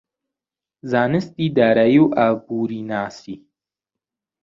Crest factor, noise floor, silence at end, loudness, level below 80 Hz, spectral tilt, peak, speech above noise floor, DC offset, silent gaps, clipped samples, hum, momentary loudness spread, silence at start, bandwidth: 18 dB; -89 dBFS; 1.05 s; -18 LUFS; -60 dBFS; -8 dB/octave; -2 dBFS; 71 dB; under 0.1%; none; under 0.1%; none; 22 LU; 0.85 s; 7.4 kHz